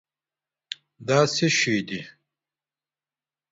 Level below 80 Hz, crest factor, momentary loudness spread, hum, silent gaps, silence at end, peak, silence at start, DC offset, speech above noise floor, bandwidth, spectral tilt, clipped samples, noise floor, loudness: -66 dBFS; 22 dB; 18 LU; none; none; 1.4 s; -6 dBFS; 1 s; under 0.1%; over 67 dB; 8 kHz; -4 dB/octave; under 0.1%; under -90 dBFS; -22 LUFS